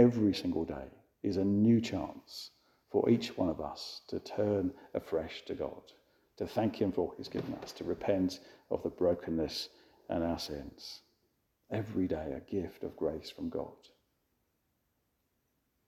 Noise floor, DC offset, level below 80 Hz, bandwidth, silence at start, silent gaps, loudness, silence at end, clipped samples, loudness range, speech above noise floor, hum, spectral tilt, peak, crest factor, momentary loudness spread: -79 dBFS; under 0.1%; -60 dBFS; 14.5 kHz; 0 s; none; -35 LUFS; 2.15 s; under 0.1%; 6 LU; 46 dB; none; -7 dB/octave; -12 dBFS; 22 dB; 15 LU